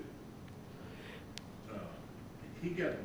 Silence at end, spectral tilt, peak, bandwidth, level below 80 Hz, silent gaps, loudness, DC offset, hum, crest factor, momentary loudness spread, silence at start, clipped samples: 0 s; -6 dB/octave; -22 dBFS; over 20 kHz; -62 dBFS; none; -46 LUFS; under 0.1%; none; 22 dB; 13 LU; 0 s; under 0.1%